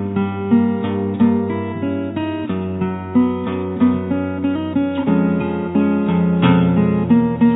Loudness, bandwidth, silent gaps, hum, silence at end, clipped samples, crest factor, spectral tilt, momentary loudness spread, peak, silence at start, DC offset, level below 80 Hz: -18 LUFS; 4 kHz; none; none; 0 s; under 0.1%; 14 dB; -12 dB/octave; 8 LU; -2 dBFS; 0 s; under 0.1%; -48 dBFS